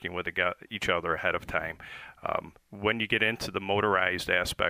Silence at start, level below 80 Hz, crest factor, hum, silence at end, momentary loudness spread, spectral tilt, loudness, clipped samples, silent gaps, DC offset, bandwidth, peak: 0 s; -54 dBFS; 22 dB; none; 0 s; 12 LU; -4 dB/octave; -29 LUFS; under 0.1%; none; under 0.1%; 15.5 kHz; -8 dBFS